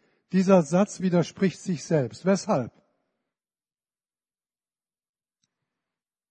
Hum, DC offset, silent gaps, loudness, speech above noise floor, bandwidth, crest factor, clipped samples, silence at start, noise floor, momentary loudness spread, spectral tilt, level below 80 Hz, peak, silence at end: none; under 0.1%; none; -24 LUFS; over 67 dB; 9.2 kHz; 22 dB; under 0.1%; 0.35 s; under -90 dBFS; 8 LU; -6.5 dB/octave; -72 dBFS; -6 dBFS; 3.6 s